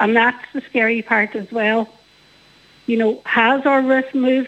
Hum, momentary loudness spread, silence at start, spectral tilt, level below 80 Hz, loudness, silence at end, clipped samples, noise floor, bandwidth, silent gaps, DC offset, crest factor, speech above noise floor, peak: none; 8 LU; 0 s; -6 dB/octave; -66 dBFS; -17 LUFS; 0 s; under 0.1%; -51 dBFS; 8 kHz; none; under 0.1%; 16 dB; 34 dB; -2 dBFS